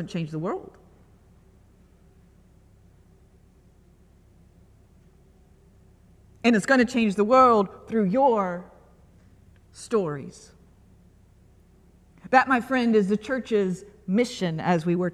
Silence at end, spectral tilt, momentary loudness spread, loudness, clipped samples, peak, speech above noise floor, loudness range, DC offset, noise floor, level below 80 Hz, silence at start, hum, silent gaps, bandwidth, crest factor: 0 s; -6 dB/octave; 13 LU; -23 LUFS; under 0.1%; -4 dBFS; 33 dB; 13 LU; under 0.1%; -56 dBFS; -58 dBFS; 0 s; none; none; 12.5 kHz; 22 dB